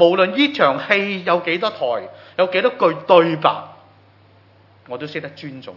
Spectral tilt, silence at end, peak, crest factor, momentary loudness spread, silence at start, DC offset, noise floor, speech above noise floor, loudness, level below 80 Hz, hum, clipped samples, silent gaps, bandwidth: -6.5 dB/octave; 0 s; 0 dBFS; 18 dB; 16 LU; 0 s; under 0.1%; -51 dBFS; 33 dB; -17 LUFS; -76 dBFS; none; under 0.1%; none; 6 kHz